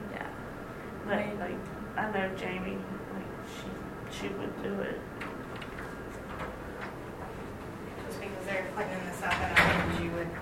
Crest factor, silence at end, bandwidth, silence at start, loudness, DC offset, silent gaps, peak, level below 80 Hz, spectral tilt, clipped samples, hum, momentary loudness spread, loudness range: 26 dB; 0 s; 16 kHz; 0 s; -34 LUFS; under 0.1%; none; -8 dBFS; -50 dBFS; -5 dB/octave; under 0.1%; none; 12 LU; 9 LU